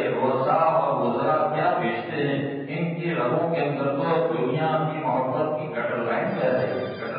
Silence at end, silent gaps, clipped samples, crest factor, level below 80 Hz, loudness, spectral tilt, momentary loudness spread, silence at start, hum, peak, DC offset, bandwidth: 0 s; none; under 0.1%; 14 dB; -70 dBFS; -24 LUFS; -11.5 dB/octave; 6 LU; 0 s; none; -10 dBFS; under 0.1%; 5.2 kHz